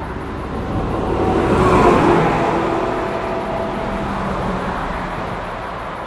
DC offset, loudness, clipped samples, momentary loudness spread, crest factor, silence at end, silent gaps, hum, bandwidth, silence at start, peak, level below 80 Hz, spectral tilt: under 0.1%; -18 LUFS; under 0.1%; 13 LU; 18 dB; 0 s; none; none; 13 kHz; 0 s; 0 dBFS; -30 dBFS; -7 dB/octave